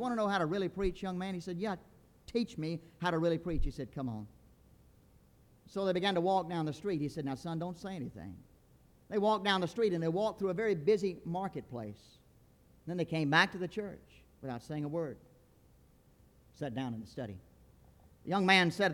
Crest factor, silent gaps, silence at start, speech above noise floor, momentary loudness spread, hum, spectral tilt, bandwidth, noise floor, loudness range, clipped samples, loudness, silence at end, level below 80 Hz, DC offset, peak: 24 dB; none; 0 s; 30 dB; 16 LU; none; -6 dB/octave; 18 kHz; -64 dBFS; 9 LU; under 0.1%; -34 LUFS; 0 s; -52 dBFS; under 0.1%; -12 dBFS